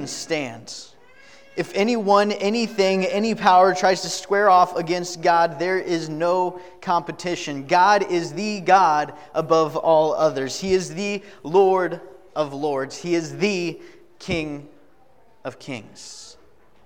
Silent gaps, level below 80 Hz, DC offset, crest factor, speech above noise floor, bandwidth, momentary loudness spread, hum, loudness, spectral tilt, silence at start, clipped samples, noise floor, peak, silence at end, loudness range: none; -58 dBFS; 0.3%; 20 dB; 36 dB; 16.5 kHz; 18 LU; none; -21 LUFS; -4.5 dB/octave; 0 s; under 0.1%; -57 dBFS; -2 dBFS; 0.55 s; 8 LU